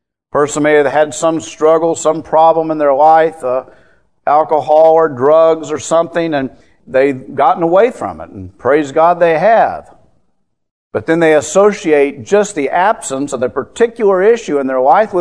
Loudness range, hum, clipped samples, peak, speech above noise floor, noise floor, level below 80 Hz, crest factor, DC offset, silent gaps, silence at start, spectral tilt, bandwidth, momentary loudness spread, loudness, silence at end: 3 LU; none; 0.1%; 0 dBFS; 52 dB; -64 dBFS; -54 dBFS; 12 dB; 0.3%; 10.71-10.91 s; 0.35 s; -5 dB/octave; 11 kHz; 10 LU; -12 LUFS; 0 s